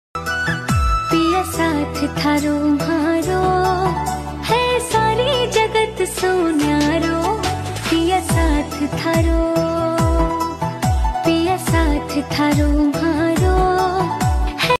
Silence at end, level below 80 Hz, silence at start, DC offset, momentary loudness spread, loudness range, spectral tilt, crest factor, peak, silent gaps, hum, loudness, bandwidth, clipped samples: 0.05 s; -26 dBFS; 0.15 s; under 0.1%; 5 LU; 1 LU; -5.5 dB/octave; 12 dB; -6 dBFS; none; none; -18 LUFS; 14 kHz; under 0.1%